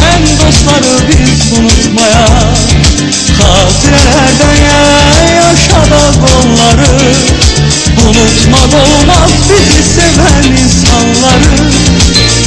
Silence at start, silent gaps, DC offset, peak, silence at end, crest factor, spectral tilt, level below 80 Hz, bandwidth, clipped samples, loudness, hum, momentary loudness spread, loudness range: 0 s; none; under 0.1%; 0 dBFS; 0 s; 4 dB; -4 dB/octave; -12 dBFS; 11 kHz; 8%; -5 LUFS; none; 2 LU; 1 LU